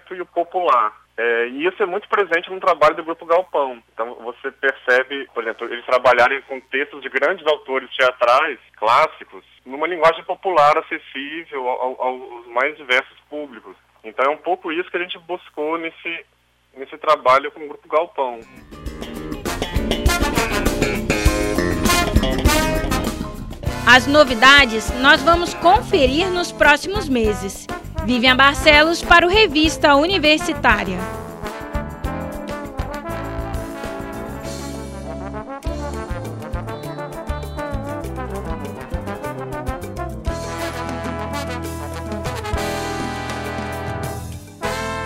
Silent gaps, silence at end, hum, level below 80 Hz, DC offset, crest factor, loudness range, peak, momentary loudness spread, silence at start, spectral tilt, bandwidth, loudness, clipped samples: none; 0 s; none; -32 dBFS; under 0.1%; 20 dB; 14 LU; 0 dBFS; 16 LU; 0.1 s; -4 dB/octave; 16 kHz; -18 LUFS; under 0.1%